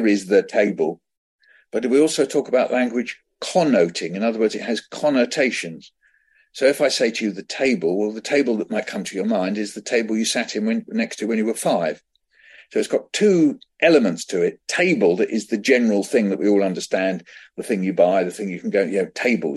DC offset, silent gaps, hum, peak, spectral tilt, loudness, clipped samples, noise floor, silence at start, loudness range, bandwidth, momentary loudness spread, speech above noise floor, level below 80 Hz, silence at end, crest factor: under 0.1%; 1.17-1.39 s; none; -2 dBFS; -4.5 dB/octave; -20 LUFS; under 0.1%; -60 dBFS; 0 s; 4 LU; 12.5 kHz; 9 LU; 40 dB; -70 dBFS; 0 s; 18 dB